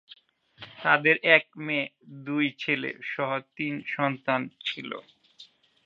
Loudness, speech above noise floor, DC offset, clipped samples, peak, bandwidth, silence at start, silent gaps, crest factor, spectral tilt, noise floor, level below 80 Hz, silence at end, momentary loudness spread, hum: -26 LUFS; 28 dB; under 0.1%; under 0.1%; -4 dBFS; 7.4 kHz; 0.6 s; none; 24 dB; -6.5 dB/octave; -55 dBFS; -80 dBFS; 0.4 s; 16 LU; none